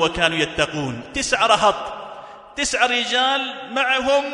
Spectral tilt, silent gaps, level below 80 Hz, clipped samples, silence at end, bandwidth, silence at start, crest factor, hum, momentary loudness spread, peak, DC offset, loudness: -2.5 dB/octave; none; -46 dBFS; under 0.1%; 0 s; 11 kHz; 0 s; 20 dB; none; 15 LU; -2 dBFS; under 0.1%; -19 LUFS